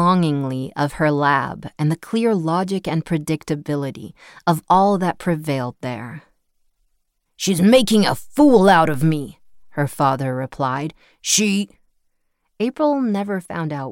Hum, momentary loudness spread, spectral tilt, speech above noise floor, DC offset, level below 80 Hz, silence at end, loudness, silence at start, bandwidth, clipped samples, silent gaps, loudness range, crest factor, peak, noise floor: none; 15 LU; -5 dB/octave; 50 dB; under 0.1%; -52 dBFS; 0 s; -19 LUFS; 0 s; 17 kHz; under 0.1%; none; 5 LU; 16 dB; -4 dBFS; -68 dBFS